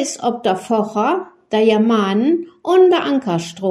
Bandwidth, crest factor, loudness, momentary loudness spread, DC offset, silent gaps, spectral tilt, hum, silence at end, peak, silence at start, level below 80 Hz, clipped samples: 12 kHz; 14 dB; -16 LUFS; 8 LU; under 0.1%; none; -5.5 dB/octave; none; 0 s; -2 dBFS; 0 s; -66 dBFS; under 0.1%